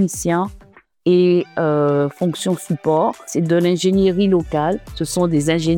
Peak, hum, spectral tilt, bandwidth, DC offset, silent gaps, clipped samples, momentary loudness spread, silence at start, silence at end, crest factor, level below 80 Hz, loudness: -4 dBFS; none; -6 dB/octave; 17.5 kHz; under 0.1%; none; under 0.1%; 7 LU; 0 s; 0 s; 14 dB; -44 dBFS; -18 LUFS